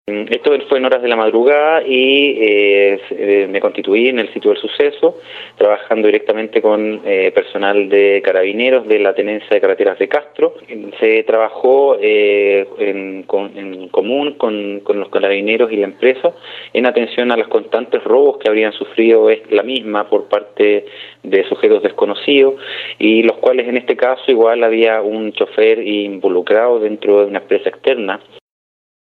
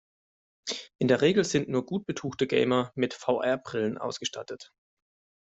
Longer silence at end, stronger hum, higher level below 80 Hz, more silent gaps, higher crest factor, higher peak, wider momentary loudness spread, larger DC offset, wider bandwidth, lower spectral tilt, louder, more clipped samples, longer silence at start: first, 0.95 s vs 0.75 s; neither; second, -72 dBFS vs -66 dBFS; second, none vs 0.95-0.99 s; second, 14 dB vs 20 dB; first, 0 dBFS vs -10 dBFS; second, 8 LU vs 12 LU; neither; second, 4.4 kHz vs 8.2 kHz; first, -6.5 dB/octave vs -5 dB/octave; first, -14 LUFS vs -28 LUFS; neither; second, 0.05 s vs 0.65 s